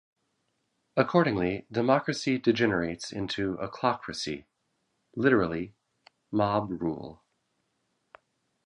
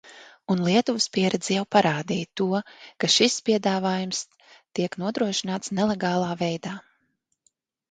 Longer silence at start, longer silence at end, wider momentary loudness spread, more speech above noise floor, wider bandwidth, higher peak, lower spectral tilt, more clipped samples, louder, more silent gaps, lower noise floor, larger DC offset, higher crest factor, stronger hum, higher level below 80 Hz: first, 0.95 s vs 0.05 s; first, 1.5 s vs 1.1 s; about the same, 12 LU vs 11 LU; about the same, 50 dB vs 49 dB; first, 11 kHz vs 9.4 kHz; about the same, -6 dBFS vs -4 dBFS; first, -6 dB/octave vs -4 dB/octave; neither; second, -28 LUFS vs -24 LUFS; neither; first, -77 dBFS vs -73 dBFS; neither; about the same, 24 dB vs 20 dB; neither; first, -58 dBFS vs -66 dBFS